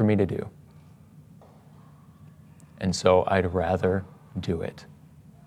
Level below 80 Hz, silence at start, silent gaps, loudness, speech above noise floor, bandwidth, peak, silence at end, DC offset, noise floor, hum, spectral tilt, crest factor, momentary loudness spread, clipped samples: -58 dBFS; 0 s; none; -26 LUFS; 27 dB; 12 kHz; -6 dBFS; 0.6 s; under 0.1%; -51 dBFS; none; -6.5 dB/octave; 22 dB; 16 LU; under 0.1%